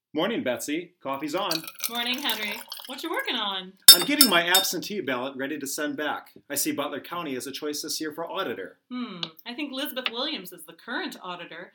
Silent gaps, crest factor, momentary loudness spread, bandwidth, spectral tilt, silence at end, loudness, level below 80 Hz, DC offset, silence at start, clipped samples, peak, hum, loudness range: none; 26 dB; 18 LU; 19 kHz; -1 dB/octave; 0.05 s; -23 LUFS; -78 dBFS; under 0.1%; 0.15 s; under 0.1%; 0 dBFS; none; 13 LU